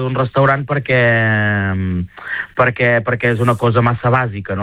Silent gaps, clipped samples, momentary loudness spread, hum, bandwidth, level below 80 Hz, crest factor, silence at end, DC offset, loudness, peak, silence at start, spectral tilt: none; under 0.1%; 9 LU; none; 11 kHz; -44 dBFS; 14 dB; 0 s; under 0.1%; -15 LUFS; -2 dBFS; 0 s; -8 dB/octave